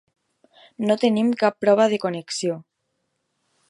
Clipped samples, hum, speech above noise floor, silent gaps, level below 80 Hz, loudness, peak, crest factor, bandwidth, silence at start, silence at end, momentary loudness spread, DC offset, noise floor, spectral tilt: under 0.1%; none; 54 dB; none; -72 dBFS; -21 LUFS; -4 dBFS; 18 dB; 11.5 kHz; 0.8 s; 1.1 s; 10 LU; under 0.1%; -75 dBFS; -5 dB/octave